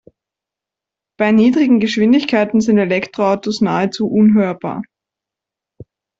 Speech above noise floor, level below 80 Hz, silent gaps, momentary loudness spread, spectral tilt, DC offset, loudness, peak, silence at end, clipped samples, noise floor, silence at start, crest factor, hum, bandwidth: 72 dB; -56 dBFS; none; 8 LU; -6.5 dB/octave; under 0.1%; -14 LUFS; -2 dBFS; 0.35 s; under 0.1%; -86 dBFS; 1.2 s; 14 dB; none; 7.6 kHz